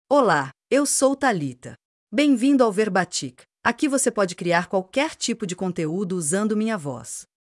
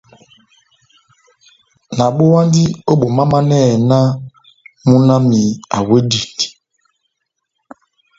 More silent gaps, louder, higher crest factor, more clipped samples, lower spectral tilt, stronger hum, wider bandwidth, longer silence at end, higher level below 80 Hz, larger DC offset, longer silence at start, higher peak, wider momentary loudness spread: first, 1.85-2.07 s vs none; second, -22 LUFS vs -13 LUFS; about the same, 18 dB vs 14 dB; neither; second, -4 dB/octave vs -6.5 dB/octave; neither; first, 12 kHz vs 7.8 kHz; second, 0.35 s vs 1.7 s; second, -66 dBFS vs -50 dBFS; neither; second, 0.1 s vs 1.9 s; second, -4 dBFS vs 0 dBFS; about the same, 11 LU vs 9 LU